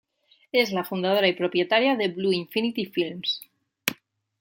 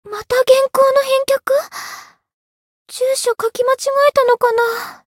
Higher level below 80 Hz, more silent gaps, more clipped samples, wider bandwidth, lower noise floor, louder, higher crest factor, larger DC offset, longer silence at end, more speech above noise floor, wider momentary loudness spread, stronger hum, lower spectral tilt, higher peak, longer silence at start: second, -72 dBFS vs -60 dBFS; second, none vs 2.34-2.86 s; neither; about the same, 17 kHz vs 17 kHz; first, -55 dBFS vs -35 dBFS; second, -25 LUFS vs -15 LUFS; first, 24 dB vs 16 dB; neither; first, 0.5 s vs 0.2 s; first, 31 dB vs 20 dB; second, 9 LU vs 15 LU; neither; first, -4.5 dB/octave vs -1 dB/octave; about the same, -2 dBFS vs 0 dBFS; first, 0.55 s vs 0.05 s